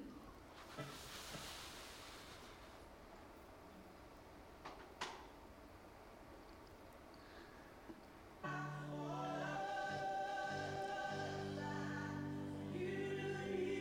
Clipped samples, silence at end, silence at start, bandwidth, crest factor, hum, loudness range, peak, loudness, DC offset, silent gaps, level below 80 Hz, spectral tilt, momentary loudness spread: under 0.1%; 0 s; 0 s; 16.5 kHz; 16 dB; none; 12 LU; -32 dBFS; -47 LUFS; under 0.1%; none; -68 dBFS; -5 dB/octave; 16 LU